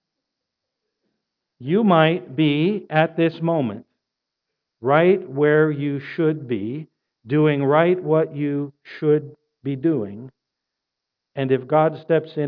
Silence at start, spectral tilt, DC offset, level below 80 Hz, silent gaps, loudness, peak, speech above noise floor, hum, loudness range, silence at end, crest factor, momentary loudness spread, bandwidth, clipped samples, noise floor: 1.6 s; -10.5 dB/octave; under 0.1%; -72 dBFS; none; -20 LUFS; -2 dBFS; 63 dB; none; 4 LU; 0 s; 20 dB; 13 LU; 5.2 kHz; under 0.1%; -82 dBFS